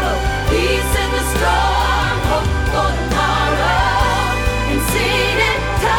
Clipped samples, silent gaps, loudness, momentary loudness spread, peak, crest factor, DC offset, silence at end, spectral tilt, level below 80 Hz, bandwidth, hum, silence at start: under 0.1%; none; -16 LUFS; 3 LU; -2 dBFS; 14 dB; under 0.1%; 0 s; -4.5 dB/octave; -22 dBFS; 18.5 kHz; none; 0 s